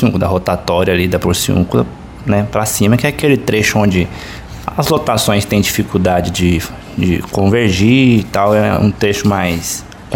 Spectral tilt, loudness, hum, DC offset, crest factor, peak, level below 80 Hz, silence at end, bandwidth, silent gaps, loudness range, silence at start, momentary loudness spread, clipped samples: -5.5 dB/octave; -13 LUFS; none; under 0.1%; 14 dB; 0 dBFS; -34 dBFS; 0 s; 17 kHz; none; 2 LU; 0 s; 8 LU; under 0.1%